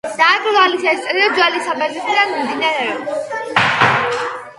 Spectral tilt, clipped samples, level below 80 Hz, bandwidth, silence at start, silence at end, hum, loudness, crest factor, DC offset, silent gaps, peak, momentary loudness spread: -3.5 dB/octave; under 0.1%; -60 dBFS; 11.5 kHz; 0.05 s; 0.05 s; none; -15 LUFS; 16 dB; under 0.1%; none; 0 dBFS; 8 LU